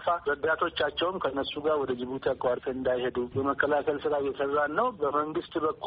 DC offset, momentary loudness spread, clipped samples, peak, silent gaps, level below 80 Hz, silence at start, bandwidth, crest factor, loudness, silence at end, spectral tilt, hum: under 0.1%; 4 LU; under 0.1%; -12 dBFS; none; -58 dBFS; 0 s; 5 kHz; 18 dB; -29 LUFS; 0 s; -2.5 dB/octave; none